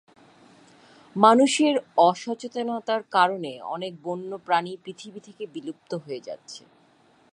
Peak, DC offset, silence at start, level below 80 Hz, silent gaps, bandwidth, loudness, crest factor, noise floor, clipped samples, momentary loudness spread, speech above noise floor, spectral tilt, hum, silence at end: -2 dBFS; under 0.1%; 1.15 s; -80 dBFS; none; 11.5 kHz; -23 LUFS; 24 dB; -59 dBFS; under 0.1%; 21 LU; 35 dB; -4 dB/octave; none; 0.75 s